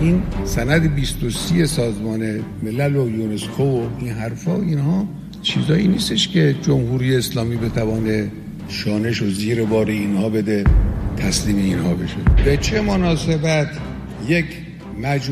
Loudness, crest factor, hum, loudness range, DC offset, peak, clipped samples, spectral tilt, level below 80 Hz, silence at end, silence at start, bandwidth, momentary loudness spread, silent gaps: -19 LUFS; 16 dB; none; 3 LU; under 0.1%; -2 dBFS; under 0.1%; -6 dB/octave; -28 dBFS; 0 s; 0 s; 14.5 kHz; 8 LU; none